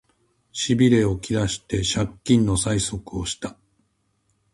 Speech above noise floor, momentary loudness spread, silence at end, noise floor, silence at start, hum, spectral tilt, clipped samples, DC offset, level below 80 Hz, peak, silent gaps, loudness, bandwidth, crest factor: 47 dB; 12 LU; 1.05 s; -69 dBFS; 0.55 s; none; -5 dB/octave; under 0.1%; under 0.1%; -42 dBFS; -6 dBFS; none; -22 LUFS; 11.5 kHz; 18 dB